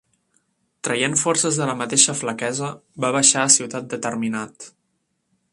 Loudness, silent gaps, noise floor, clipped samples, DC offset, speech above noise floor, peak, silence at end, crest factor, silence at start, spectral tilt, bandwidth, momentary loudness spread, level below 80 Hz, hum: -19 LUFS; none; -72 dBFS; under 0.1%; under 0.1%; 51 dB; 0 dBFS; 0.85 s; 22 dB; 0.85 s; -2 dB/octave; 11.5 kHz; 14 LU; -66 dBFS; none